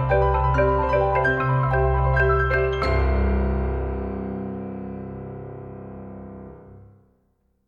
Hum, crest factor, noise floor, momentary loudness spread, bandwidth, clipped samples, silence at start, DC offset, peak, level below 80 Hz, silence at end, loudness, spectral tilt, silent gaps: none; 14 dB; -67 dBFS; 18 LU; 5.2 kHz; under 0.1%; 0 s; under 0.1%; -8 dBFS; -28 dBFS; 0.85 s; -22 LUFS; -9 dB/octave; none